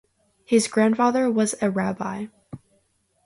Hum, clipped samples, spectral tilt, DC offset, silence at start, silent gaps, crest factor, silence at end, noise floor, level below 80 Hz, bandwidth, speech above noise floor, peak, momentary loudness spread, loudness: none; under 0.1%; -5 dB/octave; under 0.1%; 0.5 s; none; 18 dB; 0.7 s; -67 dBFS; -64 dBFS; 11.5 kHz; 46 dB; -6 dBFS; 22 LU; -22 LUFS